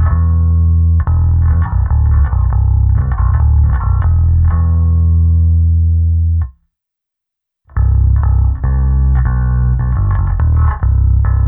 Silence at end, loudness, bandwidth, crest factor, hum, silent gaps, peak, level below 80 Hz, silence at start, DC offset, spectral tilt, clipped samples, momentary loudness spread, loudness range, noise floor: 0 s; -13 LUFS; 2.1 kHz; 8 dB; none; none; -2 dBFS; -14 dBFS; 0 s; under 0.1%; -14 dB/octave; under 0.1%; 3 LU; 3 LU; -80 dBFS